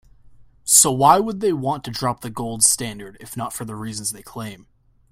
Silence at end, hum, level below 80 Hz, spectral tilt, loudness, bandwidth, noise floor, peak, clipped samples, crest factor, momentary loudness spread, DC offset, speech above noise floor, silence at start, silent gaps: 0.55 s; none; -54 dBFS; -3 dB/octave; -18 LUFS; 16.5 kHz; -48 dBFS; 0 dBFS; under 0.1%; 22 dB; 20 LU; under 0.1%; 26 dB; 0.25 s; none